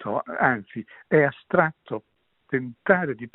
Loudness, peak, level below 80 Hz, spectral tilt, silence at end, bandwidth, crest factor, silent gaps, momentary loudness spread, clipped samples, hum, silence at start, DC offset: -23 LUFS; -2 dBFS; -64 dBFS; -6 dB/octave; 0.05 s; 4.1 kHz; 22 dB; none; 15 LU; under 0.1%; none; 0 s; under 0.1%